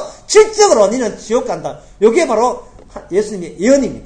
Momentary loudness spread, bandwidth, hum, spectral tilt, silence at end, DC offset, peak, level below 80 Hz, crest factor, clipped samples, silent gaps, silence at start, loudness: 13 LU; 9.8 kHz; none; -3.5 dB/octave; 0 s; under 0.1%; 0 dBFS; -42 dBFS; 14 dB; 0.1%; none; 0 s; -14 LUFS